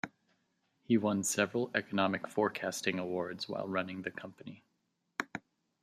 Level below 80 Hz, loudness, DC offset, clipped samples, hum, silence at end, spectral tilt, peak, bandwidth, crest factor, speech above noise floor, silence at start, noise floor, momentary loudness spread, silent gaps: -78 dBFS; -34 LUFS; under 0.1%; under 0.1%; none; 0.45 s; -4 dB/octave; -12 dBFS; 15 kHz; 24 dB; 46 dB; 0.05 s; -81 dBFS; 15 LU; none